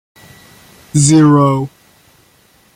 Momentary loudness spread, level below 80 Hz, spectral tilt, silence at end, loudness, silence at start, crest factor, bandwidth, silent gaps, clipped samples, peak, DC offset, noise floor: 12 LU; -48 dBFS; -6 dB/octave; 1.1 s; -11 LUFS; 0.95 s; 14 dB; 15 kHz; none; under 0.1%; 0 dBFS; under 0.1%; -51 dBFS